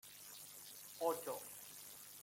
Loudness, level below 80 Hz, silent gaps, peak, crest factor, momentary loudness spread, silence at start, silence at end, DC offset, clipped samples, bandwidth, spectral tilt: -47 LUFS; -86 dBFS; none; -26 dBFS; 22 dB; 12 LU; 0.05 s; 0 s; under 0.1%; under 0.1%; 16.5 kHz; -2 dB/octave